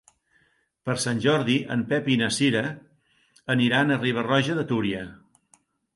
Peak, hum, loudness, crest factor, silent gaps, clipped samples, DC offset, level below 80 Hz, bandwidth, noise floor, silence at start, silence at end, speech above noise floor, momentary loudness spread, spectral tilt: -8 dBFS; none; -24 LUFS; 18 dB; none; under 0.1%; under 0.1%; -62 dBFS; 11.5 kHz; -66 dBFS; 0.85 s; 0.8 s; 43 dB; 12 LU; -5 dB/octave